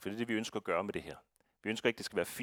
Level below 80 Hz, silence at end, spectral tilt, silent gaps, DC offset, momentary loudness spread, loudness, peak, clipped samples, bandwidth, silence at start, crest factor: -70 dBFS; 0 s; -4 dB/octave; none; under 0.1%; 10 LU; -37 LUFS; -14 dBFS; under 0.1%; 19 kHz; 0 s; 24 dB